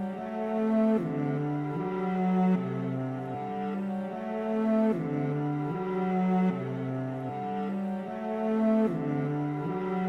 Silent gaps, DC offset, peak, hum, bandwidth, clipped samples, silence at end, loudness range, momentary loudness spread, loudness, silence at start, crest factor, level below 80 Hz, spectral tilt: none; under 0.1%; -16 dBFS; none; 6.2 kHz; under 0.1%; 0 s; 2 LU; 8 LU; -30 LUFS; 0 s; 14 dB; -68 dBFS; -9.5 dB/octave